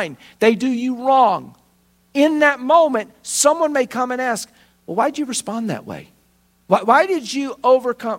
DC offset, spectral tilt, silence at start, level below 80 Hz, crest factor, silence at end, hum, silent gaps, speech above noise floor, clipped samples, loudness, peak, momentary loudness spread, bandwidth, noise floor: under 0.1%; -3.5 dB/octave; 0 s; -66 dBFS; 18 dB; 0 s; none; none; 41 dB; under 0.1%; -18 LUFS; 0 dBFS; 12 LU; 16.5 kHz; -59 dBFS